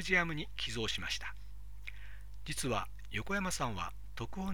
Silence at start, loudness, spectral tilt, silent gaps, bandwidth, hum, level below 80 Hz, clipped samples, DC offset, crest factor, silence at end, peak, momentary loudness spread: 0 s; -37 LUFS; -3.5 dB/octave; none; 19 kHz; 50 Hz at -50 dBFS; -50 dBFS; under 0.1%; 0.7%; 22 dB; 0 s; -16 dBFS; 15 LU